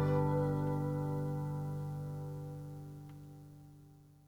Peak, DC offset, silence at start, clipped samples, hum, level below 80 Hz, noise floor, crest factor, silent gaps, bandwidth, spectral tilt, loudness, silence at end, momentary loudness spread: -22 dBFS; under 0.1%; 0 s; under 0.1%; none; -58 dBFS; -59 dBFS; 16 dB; none; 13 kHz; -9.5 dB/octave; -38 LUFS; 0.15 s; 21 LU